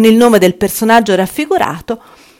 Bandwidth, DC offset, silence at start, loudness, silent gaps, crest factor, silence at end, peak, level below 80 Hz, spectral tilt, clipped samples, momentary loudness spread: 17 kHz; under 0.1%; 0 s; -11 LUFS; none; 10 dB; 0.4 s; 0 dBFS; -46 dBFS; -5 dB/octave; 1%; 15 LU